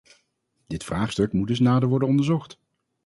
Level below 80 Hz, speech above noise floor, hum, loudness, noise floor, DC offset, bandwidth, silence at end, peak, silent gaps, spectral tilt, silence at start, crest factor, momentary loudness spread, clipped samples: -50 dBFS; 50 dB; none; -23 LUFS; -72 dBFS; under 0.1%; 11.5 kHz; 0.55 s; -8 dBFS; none; -7 dB/octave; 0.7 s; 16 dB; 11 LU; under 0.1%